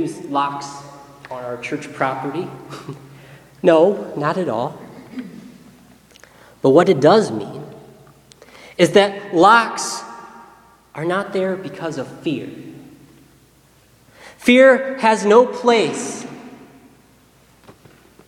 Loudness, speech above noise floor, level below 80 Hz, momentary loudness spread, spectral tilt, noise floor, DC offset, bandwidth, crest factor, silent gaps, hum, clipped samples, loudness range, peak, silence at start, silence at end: -17 LUFS; 36 dB; -62 dBFS; 23 LU; -5 dB/octave; -52 dBFS; under 0.1%; 14 kHz; 20 dB; none; none; under 0.1%; 10 LU; 0 dBFS; 0 s; 1.75 s